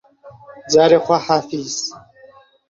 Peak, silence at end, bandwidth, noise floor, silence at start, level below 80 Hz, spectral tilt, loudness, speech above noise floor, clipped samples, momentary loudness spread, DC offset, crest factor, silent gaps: 0 dBFS; 0.7 s; 7.8 kHz; -47 dBFS; 0.25 s; -58 dBFS; -4 dB/octave; -16 LUFS; 31 dB; under 0.1%; 12 LU; under 0.1%; 18 dB; none